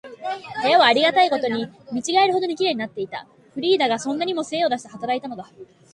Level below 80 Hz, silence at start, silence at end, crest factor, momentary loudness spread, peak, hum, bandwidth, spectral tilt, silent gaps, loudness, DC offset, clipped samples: -68 dBFS; 0.05 s; 0.3 s; 20 dB; 15 LU; -2 dBFS; none; 11.5 kHz; -3 dB/octave; none; -21 LUFS; under 0.1%; under 0.1%